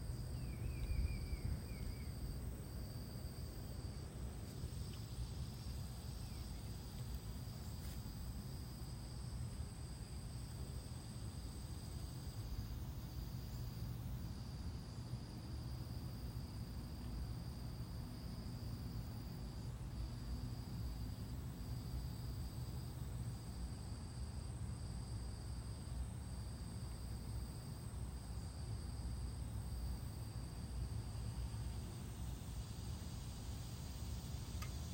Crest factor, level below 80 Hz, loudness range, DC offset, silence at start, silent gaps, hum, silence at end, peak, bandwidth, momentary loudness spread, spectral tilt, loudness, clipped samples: 16 dB; -50 dBFS; 2 LU; under 0.1%; 0 s; none; none; 0 s; -30 dBFS; 16 kHz; 3 LU; -5.5 dB/octave; -48 LUFS; under 0.1%